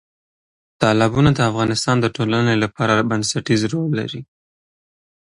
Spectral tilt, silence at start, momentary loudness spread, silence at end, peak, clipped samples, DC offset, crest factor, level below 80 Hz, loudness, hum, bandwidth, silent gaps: -5.5 dB/octave; 0.8 s; 6 LU; 1.15 s; 0 dBFS; under 0.1%; under 0.1%; 18 dB; -46 dBFS; -18 LUFS; none; 11.5 kHz; none